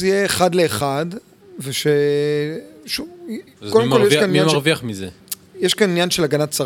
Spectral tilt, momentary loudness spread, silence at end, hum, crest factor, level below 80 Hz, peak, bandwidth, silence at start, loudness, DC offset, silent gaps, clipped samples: -4.5 dB/octave; 17 LU; 0 s; none; 18 dB; -56 dBFS; 0 dBFS; 18 kHz; 0 s; -18 LUFS; under 0.1%; none; under 0.1%